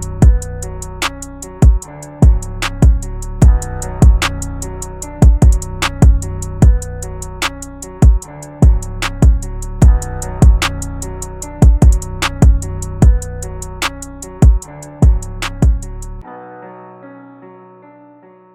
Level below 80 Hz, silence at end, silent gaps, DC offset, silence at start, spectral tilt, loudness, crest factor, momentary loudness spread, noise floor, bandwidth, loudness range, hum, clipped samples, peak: -14 dBFS; 1.05 s; none; under 0.1%; 0 s; -5.5 dB/octave; -14 LUFS; 12 dB; 17 LU; -42 dBFS; 13 kHz; 4 LU; none; under 0.1%; 0 dBFS